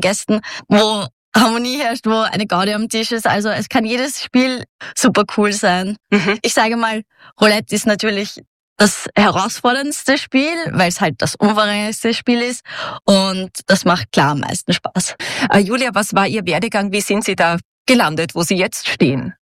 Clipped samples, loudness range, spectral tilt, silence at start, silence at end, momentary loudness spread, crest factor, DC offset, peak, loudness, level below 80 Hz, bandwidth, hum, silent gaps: under 0.1%; 1 LU; -4 dB/octave; 0 s; 0.1 s; 6 LU; 14 dB; under 0.1%; -2 dBFS; -16 LUFS; -56 dBFS; 16 kHz; none; 1.13-1.32 s, 4.69-4.79 s, 8.47-8.76 s, 17.65-17.85 s